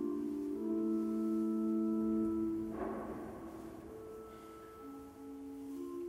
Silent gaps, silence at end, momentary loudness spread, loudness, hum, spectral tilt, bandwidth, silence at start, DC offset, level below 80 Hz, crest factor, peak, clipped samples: none; 0 s; 16 LU; -38 LUFS; none; -8 dB/octave; 15.5 kHz; 0 s; under 0.1%; -64 dBFS; 12 dB; -26 dBFS; under 0.1%